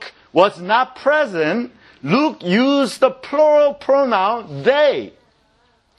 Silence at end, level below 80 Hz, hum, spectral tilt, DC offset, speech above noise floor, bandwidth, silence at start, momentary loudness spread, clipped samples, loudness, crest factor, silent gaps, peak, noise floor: 0.9 s; -64 dBFS; none; -5.5 dB/octave; under 0.1%; 43 dB; 12 kHz; 0 s; 7 LU; under 0.1%; -17 LUFS; 18 dB; none; 0 dBFS; -59 dBFS